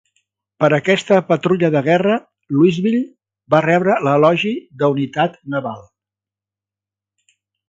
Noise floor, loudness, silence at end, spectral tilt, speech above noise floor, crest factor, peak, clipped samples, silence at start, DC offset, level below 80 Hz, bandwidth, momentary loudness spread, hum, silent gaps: -88 dBFS; -16 LUFS; 1.9 s; -7 dB/octave; 73 dB; 18 dB; 0 dBFS; under 0.1%; 0.6 s; under 0.1%; -62 dBFS; 7.8 kHz; 10 LU; 50 Hz at -45 dBFS; none